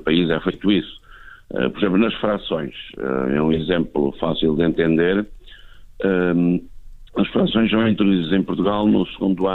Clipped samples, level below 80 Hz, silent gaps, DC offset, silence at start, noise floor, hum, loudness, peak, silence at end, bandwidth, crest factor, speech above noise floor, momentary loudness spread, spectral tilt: under 0.1%; -42 dBFS; none; under 0.1%; 0 s; -41 dBFS; none; -20 LUFS; -4 dBFS; 0 s; 4.3 kHz; 16 dB; 22 dB; 8 LU; -9 dB/octave